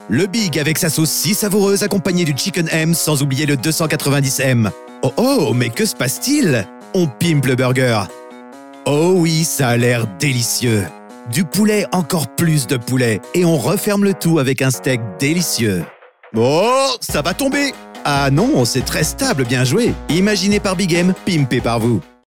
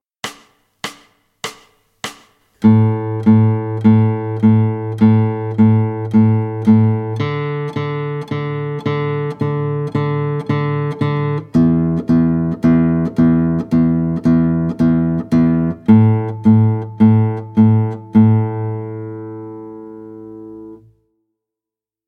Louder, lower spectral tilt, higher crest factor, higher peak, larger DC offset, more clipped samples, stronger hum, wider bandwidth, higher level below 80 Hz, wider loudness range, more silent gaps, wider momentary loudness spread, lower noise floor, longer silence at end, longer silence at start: about the same, -16 LUFS vs -15 LUFS; second, -4.5 dB/octave vs -9 dB/octave; about the same, 12 dB vs 14 dB; second, -4 dBFS vs 0 dBFS; first, 0.3% vs under 0.1%; neither; neither; first, 19 kHz vs 8.4 kHz; about the same, -42 dBFS vs -44 dBFS; second, 1 LU vs 6 LU; neither; second, 5 LU vs 17 LU; second, -36 dBFS vs -87 dBFS; second, 0.35 s vs 1.3 s; second, 0 s vs 0.25 s